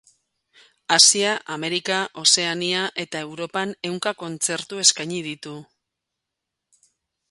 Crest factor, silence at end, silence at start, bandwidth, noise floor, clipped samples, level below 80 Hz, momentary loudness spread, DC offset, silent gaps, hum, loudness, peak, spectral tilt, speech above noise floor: 24 dB; 1.65 s; 0.9 s; 12 kHz; -83 dBFS; under 0.1%; -72 dBFS; 17 LU; under 0.1%; none; none; -20 LUFS; 0 dBFS; -1 dB/octave; 60 dB